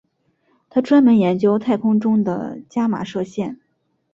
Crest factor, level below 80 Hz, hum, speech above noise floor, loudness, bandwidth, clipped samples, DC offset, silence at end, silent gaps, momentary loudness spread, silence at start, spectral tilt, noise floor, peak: 14 dB; -62 dBFS; none; 51 dB; -18 LUFS; 7.4 kHz; under 0.1%; under 0.1%; 0.6 s; none; 13 LU; 0.75 s; -8 dB/octave; -68 dBFS; -4 dBFS